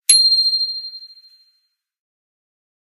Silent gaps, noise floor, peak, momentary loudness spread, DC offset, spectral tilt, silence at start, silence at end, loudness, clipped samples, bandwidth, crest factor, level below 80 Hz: none; -68 dBFS; 0 dBFS; 22 LU; under 0.1%; 7 dB/octave; 0.1 s; 1.85 s; -13 LUFS; under 0.1%; 15.5 kHz; 20 dB; -72 dBFS